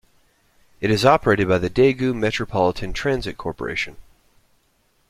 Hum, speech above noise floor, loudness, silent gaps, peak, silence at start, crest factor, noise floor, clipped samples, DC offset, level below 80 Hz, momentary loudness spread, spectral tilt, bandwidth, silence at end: none; 44 dB; -20 LUFS; none; -2 dBFS; 0.8 s; 20 dB; -63 dBFS; under 0.1%; under 0.1%; -42 dBFS; 11 LU; -6 dB/octave; 14 kHz; 1.05 s